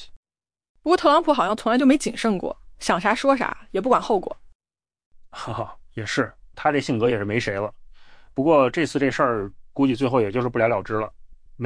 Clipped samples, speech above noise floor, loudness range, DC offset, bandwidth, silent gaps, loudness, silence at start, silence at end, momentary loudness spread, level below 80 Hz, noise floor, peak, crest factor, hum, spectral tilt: under 0.1%; 23 dB; 5 LU; under 0.1%; 10.5 kHz; 0.16-0.23 s, 0.69-0.75 s, 4.55-4.60 s, 5.06-5.11 s; -22 LUFS; 0 s; 0 s; 14 LU; -50 dBFS; -44 dBFS; -6 dBFS; 18 dB; none; -5.5 dB/octave